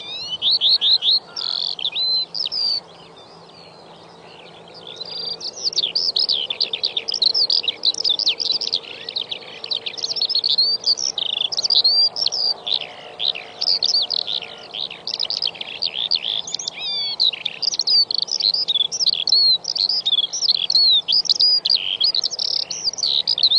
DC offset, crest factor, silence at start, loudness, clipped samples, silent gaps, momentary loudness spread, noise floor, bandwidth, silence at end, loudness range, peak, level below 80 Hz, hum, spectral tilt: under 0.1%; 18 dB; 0 s; -17 LUFS; under 0.1%; none; 12 LU; -43 dBFS; 10 kHz; 0 s; 8 LU; -4 dBFS; -70 dBFS; none; 1 dB/octave